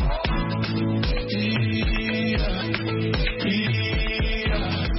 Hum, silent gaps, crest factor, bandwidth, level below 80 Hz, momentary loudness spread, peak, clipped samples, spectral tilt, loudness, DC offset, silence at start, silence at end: none; none; 16 dB; 5.8 kHz; -28 dBFS; 2 LU; -8 dBFS; under 0.1%; -9.5 dB/octave; -24 LUFS; under 0.1%; 0 s; 0 s